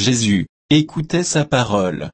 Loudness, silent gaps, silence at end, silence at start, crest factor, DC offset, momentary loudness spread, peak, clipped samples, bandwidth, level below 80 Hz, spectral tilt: -18 LUFS; 0.49-0.69 s; 0.05 s; 0 s; 14 dB; under 0.1%; 4 LU; -4 dBFS; under 0.1%; 8.8 kHz; -46 dBFS; -4.5 dB/octave